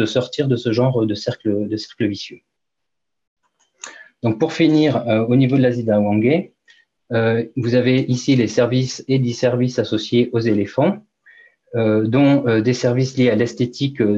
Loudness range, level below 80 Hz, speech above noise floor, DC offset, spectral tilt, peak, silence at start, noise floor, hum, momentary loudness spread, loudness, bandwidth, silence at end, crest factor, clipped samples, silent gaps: 5 LU; -62 dBFS; 65 dB; under 0.1%; -7 dB/octave; -4 dBFS; 0 s; -82 dBFS; none; 8 LU; -18 LUFS; 7.8 kHz; 0 s; 14 dB; under 0.1%; 3.27-3.36 s